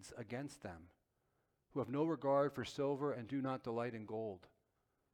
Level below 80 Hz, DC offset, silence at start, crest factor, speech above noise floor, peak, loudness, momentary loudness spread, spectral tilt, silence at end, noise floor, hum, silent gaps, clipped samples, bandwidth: -76 dBFS; under 0.1%; 0 s; 18 dB; 42 dB; -24 dBFS; -41 LUFS; 15 LU; -6.5 dB/octave; 0.65 s; -83 dBFS; none; none; under 0.1%; 15 kHz